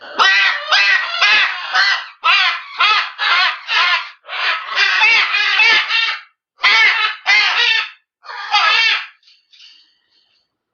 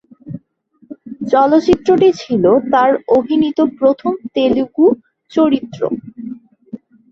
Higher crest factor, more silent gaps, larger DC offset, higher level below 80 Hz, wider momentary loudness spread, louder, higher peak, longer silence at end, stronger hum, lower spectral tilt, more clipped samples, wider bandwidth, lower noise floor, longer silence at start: about the same, 16 dB vs 14 dB; neither; neither; second, -74 dBFS vs -48 dBFS; second, 8 LU vs 21 LU; about the same, -12 LUFS vs -14 LUFS; about the same, 0 dBFS vs 0 dBFS; first, 1.65 s vs 0.35 s; neither; second, 3 dB/octave vs -7 dB/octave; neither; about the same, 7.4 kHz vs 7.4 kHz; first, -64 dBFS vs -53 dBFS; second, 0 s vs 0.25 s